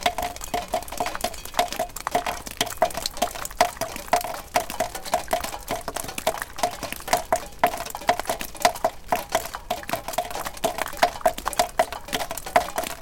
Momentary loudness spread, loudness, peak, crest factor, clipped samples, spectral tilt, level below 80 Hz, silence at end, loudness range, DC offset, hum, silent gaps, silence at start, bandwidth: 7 LU; -26 LUFS; 0 dBFS; 26 dB; under 0.1%; -2 dB/octave; -44 dBFS; 0 s; 2 LU; under 0.1%; none; none; 0 s; 17 kHz